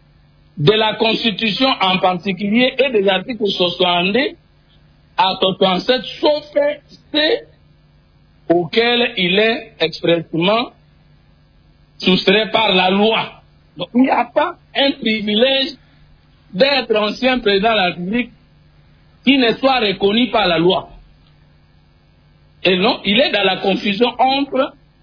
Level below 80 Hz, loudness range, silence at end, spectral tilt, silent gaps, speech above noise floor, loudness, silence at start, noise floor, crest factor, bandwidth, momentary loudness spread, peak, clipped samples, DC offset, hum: -50 dBFS; 3 LU; 0.3 s; -6.5 dB/octave; none; 35 dB; -15 LUFS; 0.55 s; -51 dBFS; 16 dB; 5.4 kHz; 7 LU; -2 dBFS; under 0.1%; under 0.1%; none